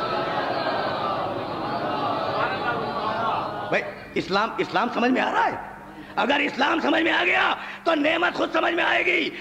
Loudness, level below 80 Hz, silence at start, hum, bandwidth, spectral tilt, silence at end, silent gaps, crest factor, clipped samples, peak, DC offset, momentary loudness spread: -23 LUFS; -58 dBFS; 0 s; none; 15 kHz; -5 dB/octave; 0 s; none; 16 dB; under 0.1%; -8 dBFS; under 0.1%; 8 LU